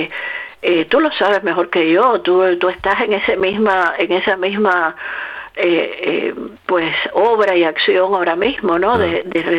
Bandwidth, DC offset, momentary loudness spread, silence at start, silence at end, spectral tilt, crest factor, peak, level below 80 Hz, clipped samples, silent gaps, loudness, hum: 6.4 kHz; under 0.1%; 8 LU; 0 s; 0 s; -6 dB/octave; 12 dB; -2 dBFS; -50 dBFS; under 0.1%; none; -15 LUFS; none